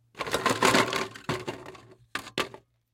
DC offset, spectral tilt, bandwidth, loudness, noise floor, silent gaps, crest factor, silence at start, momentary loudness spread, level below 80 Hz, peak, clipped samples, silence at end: under 0.1%; -3 dB/octave; 17 kHz; -27 LUFS; -49 dBFS; none; 24 dB; 0.15 s; 17 LU; -60 dBFS; -6 dBFS; under 0.1%; 0.35 s